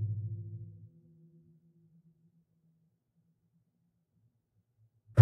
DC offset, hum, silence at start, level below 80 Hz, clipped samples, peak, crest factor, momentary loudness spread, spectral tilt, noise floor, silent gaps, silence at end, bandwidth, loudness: under 0.1%; none; 0 s; -68 dBFS; under 0.1%; -6 dBFS; 28 dB; 26 LU; -10.5 dB/octave; -78 dBFS; none; 0 s; 1.5 kHz; -39 LUFS